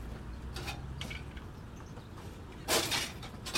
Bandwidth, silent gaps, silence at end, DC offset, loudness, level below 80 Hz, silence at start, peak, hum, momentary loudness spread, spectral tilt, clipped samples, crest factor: 16.5 kHz; none; 0 s; under 0.1%; -37 LUFS; -48 dBFS; 0 s; -16 dBFS; none; 17 LU; -2.5 dB/octave; under 0.1%; 22 dB